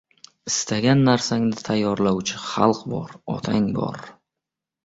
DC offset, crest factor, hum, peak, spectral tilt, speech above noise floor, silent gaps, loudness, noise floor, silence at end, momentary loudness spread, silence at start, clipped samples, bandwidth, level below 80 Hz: under 0.1%; 20 dB; none; -2 dBFS; -5 dB/octave; 64 dB; none; -22 LUFS; -86 dBFS; 0.75 s; 13 LU; 0.45 s; under 0.1%; 8 kHz; -56 dBFS